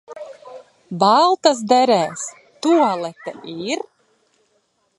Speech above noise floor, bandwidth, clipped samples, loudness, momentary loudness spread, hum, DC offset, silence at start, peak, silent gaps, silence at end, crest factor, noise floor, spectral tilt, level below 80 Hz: 48 dB; 11.5 kHz; under 0.1%; -17 LUFS; 22 LU; none; under 0.1%; 0.1 s; 0 dBFS; none; 1.2 s; 20 dB; -65 dBFS; -4 dB/octave; -72 dBFS